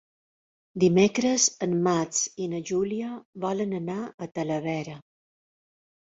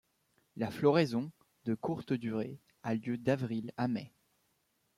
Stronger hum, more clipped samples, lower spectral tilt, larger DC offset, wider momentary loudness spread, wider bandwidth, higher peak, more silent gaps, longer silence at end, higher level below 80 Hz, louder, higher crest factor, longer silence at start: neither; neither; second, -4.5 dB/octave vs -7.5 dB/octave; neither; about the same, 13 LU vs 15 LU; second, 8 kHz vs 14.5 kHz; first, -8 dBFS vs -14 dBFS; first, 3.25-3.33 s, 4.14-4.18 s vs none; first, 1.1 s vs 0.9 s; first, -66 dBFS vs -74 dBFS; first, -26 LUFS vs -35 LUFS; about the same, 18 dB vs 20 dB; first, 0.75 s vs 0.55 s